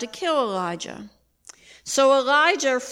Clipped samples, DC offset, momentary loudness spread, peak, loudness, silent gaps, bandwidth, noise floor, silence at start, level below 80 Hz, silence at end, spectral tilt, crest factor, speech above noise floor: under 0.1%; under 0.1%; 18 LU; -4 dBFS; -20 LUFS; none; 16 kHz; -50 dBFS; 0 s; -66 dBFS; 0 s; -2 dB/octave; 18 dB; 29 dB